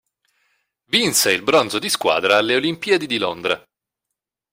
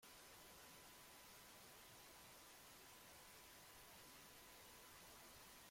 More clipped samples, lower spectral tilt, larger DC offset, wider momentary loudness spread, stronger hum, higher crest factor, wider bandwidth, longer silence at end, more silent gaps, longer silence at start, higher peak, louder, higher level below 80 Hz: neither; about the same, -2 dB/octave vs -1.5 dB/octave; neither; first, 7 LU vs 1 LU; neither; first, 18 dB vs 12 dB; about the same, 16.5 kHz vs 16.5 kHz; first, 0.95 s vs 0 s; neither; first, 0.9 s vs 0 s; first, -2 dBFS vs -52 dBFS; first, -18 LUFS vs -62 LUFS; first, -62 dBFS vs -80 dBFS